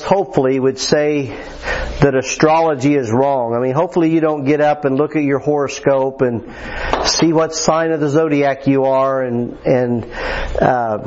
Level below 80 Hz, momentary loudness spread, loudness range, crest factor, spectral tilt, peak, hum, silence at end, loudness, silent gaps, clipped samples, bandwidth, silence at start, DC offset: -34 dBFS; 7 LU; 1 LU; 16 dB; -5 dB/octave; 0 dBFS; none; 0 s; -16 LUFS; none; under 0.1%; 8 kHz; 0 s; under 0.1%